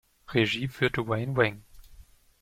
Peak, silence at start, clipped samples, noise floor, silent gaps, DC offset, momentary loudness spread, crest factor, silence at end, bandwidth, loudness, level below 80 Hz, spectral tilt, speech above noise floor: -8 dBFS; 0.3 s; under 0.1%; -53 dBFS; none; under 0.1%; 4 LU; 22 dB; 0.4 s; 15.5 kHz; -27 LUFS; -54 dBFS; -6 dB/octave; 26 dB